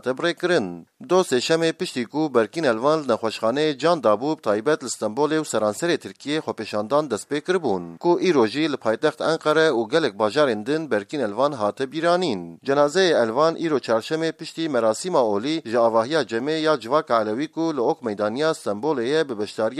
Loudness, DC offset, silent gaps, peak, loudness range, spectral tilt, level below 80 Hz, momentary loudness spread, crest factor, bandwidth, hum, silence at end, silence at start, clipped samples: -22 LUFS; under 0.1%; none; -4 dBFS; 2 LU; -4.5 dB/octave; -74 dBFS; 7 LU; 18 dB; 13.5 kHz; none; 0 s; 0.05 s; under 0.1%